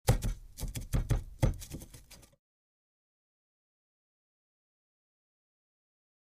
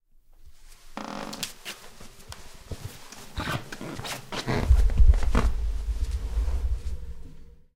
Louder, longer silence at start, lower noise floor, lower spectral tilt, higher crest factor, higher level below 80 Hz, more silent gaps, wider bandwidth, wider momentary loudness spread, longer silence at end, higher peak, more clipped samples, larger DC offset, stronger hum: second, -36 LUFS vs -29 LUFS; second, 0.05 s vs 0.4 s; first, -55 dBFS vs -50 dBFS; about the same, -5.5 dB/octave vs -5 dB/octave; first, 26 dB vs 20 dB; second, -42 dBFS vs -28 dBFS; neither; about the same, 15.5 kHz vs 16 kHz; about the same, 21 LU vs 21 LU; first, 4.15 s vs 0.25 s; second, -10 dBFS vs -6 dBFS; neither; neither; neither